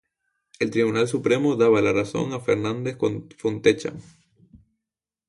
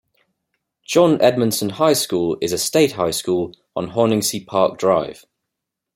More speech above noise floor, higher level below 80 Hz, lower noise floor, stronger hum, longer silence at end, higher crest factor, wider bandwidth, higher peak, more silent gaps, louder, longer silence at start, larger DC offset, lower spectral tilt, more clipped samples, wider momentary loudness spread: about the same, 65 dB vs 64 dB; about the same, -58 dBFS vs -58 dBFS; first, -87 dBFS vs -81 dBFS; neither; first, 1.25 s vs 0.85 s; about the same, 20 dB vs 18 dB; second, 11.5 kHz vs 16.5 kHz; about the same, -4 dBFS vs -2 dBFS; neither; second, -23 LUFS vs -18 LUFS; second, 0.6 s vs 0.9 s; neither; first, -6 dB/octave vs -4.5 dB/octave; neither; first, 10 LU vs 7 LU